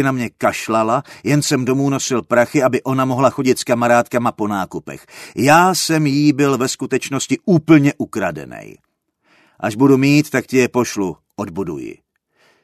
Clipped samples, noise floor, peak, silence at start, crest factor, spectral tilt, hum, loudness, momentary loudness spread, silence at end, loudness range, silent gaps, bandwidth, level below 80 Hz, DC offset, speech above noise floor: under 0.1%; -61 dBFS; 0 dBFS; 0 s; 16 dB; -5 dB/octave; none; -16 LUFS; 14 LU; 0.7 s; 3 LU; none; 13.5 kHz; -56 dBFS; under 0.1%; 45 dB